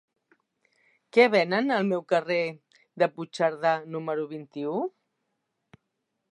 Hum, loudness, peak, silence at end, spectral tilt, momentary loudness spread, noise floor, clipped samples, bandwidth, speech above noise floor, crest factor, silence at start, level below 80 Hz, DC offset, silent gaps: none; -26 LUFS; -6 dBFS; 1.45 s; -6 dB/octave; 12 LU; -80 dBFS; under 0.1%; 11 kHz; 55 dB; 22 dB; 1.15 s; -82 dBFS; under 0.1%; none